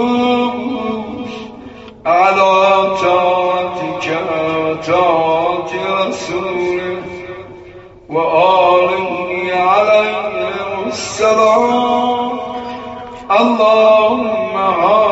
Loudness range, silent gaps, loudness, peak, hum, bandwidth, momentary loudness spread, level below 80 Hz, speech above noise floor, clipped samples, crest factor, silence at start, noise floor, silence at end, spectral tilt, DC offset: 3 LU; none; -14 LUFS; 0 dBFS; none; 8 kHz; 15 LU; -50 dBFS; 24 dB; under 0.1%; 14 dB; 0 s; -36 dBFS; 0 s; -2.5 dB/octave; under 0.1%